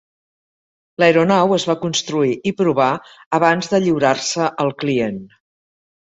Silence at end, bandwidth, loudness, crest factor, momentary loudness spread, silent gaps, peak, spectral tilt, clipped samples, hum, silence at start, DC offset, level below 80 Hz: 0.85 s; 8.4 kHz; -17 LUFS; 16 dB; 8 LU; 3.26-3.31 s; -2 dBFS; -4.5 dB/octave; under 0.1%; none; 1 s; under 0.1%; -60 dBFS